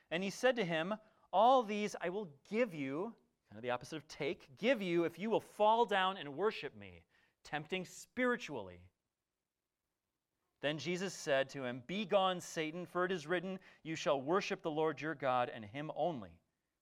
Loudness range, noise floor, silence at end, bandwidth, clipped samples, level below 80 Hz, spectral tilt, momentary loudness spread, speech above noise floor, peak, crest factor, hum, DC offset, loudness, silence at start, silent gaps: 7 LU; under -90 dBFS; 0.45 s; 15.5 kHz; under 0.1%; -78 dBFS; -4.5 dB/octave; 13 LU; over 53 dB; -18 dBFS; 20 dB; none; under 0.1%; -37 LUFS; 0.1 s; none